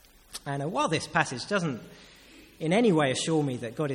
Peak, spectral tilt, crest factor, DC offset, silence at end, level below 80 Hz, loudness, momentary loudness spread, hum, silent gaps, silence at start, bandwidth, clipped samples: -8 dBFS; -5 dB/octave; 22 dB; under 0.1%; 0 s; -62 dBFS; -27 LUFS; 12 LU; none; none; 0.3 s; 16.5 kHz; under 0.1%